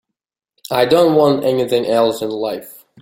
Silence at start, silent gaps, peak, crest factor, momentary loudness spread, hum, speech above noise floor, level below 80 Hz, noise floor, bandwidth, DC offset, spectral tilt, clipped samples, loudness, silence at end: 0.7 s; none; -2 dBFS; 16 dB; 11 LU; none; 67 dB; -58 dBFS; -81 dBFS; 17 kHz; under 0.1%; -5.5 dB/octave; under 0.1%; -15 LUFS; 0.25 s